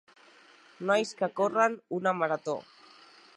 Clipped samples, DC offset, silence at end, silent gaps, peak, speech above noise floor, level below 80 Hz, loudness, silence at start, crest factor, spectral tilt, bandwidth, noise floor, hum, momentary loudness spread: under 0.1%; under 0.1%; 0.75 s; none; -10 dBFS; 29 dB; -86 dBFS; -29 LUFS; 0.8 s; 20 dB; -4.5 dB/octave; 11 kHz; -57 dBFS; none; 10 LU